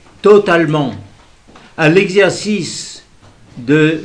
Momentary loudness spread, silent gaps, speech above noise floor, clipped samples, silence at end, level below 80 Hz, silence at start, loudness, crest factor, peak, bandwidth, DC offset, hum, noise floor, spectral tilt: 18 LU; none; 32 dB; 0.4%; 0 s; -50 dBFS; 0.25 s; -12 LUFS; 14 dB; 0 dBFS; 10.5 kHz; 0.1%; none; -43 dBFS; -5.5 dB/octave